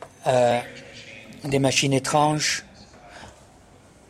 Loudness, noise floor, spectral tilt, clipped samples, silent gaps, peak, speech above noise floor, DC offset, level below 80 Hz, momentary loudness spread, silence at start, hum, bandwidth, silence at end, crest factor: -22 LUFS; -51 dBFS; -4 dB/octave; under 0.1%; none; -6 dBFS; 30 dB; under 0.1%; -56 dBFS; 22 LU; 0 s; none; 15 kHz; 0.8 s; 18 dB